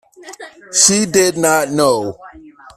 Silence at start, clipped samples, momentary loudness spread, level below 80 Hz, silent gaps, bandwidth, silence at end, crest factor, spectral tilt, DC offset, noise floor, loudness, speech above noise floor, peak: 0.2 s; under 0.1%; 23 LU; -52 dBFS; none; 16 kHz; 0.3 s; 16 dB; -2.5 dB/octave; under 0.1%; -39 dBFS; -13 LUFS; 24 dB; 0 dBFS